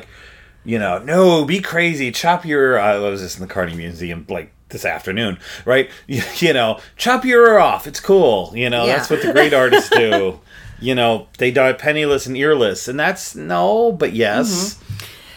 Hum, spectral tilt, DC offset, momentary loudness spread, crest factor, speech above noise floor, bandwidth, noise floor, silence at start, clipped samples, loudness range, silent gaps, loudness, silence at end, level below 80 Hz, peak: none; -4.5 dB/octave; under 0.1%; 13 LU; 16 dB; 27 dB; 19 kHz; -43 dBFS; 0 s; under 0.1%; 6 LU; none; -16 LUFS; 0 s; -48 dBFS; 0 dBFS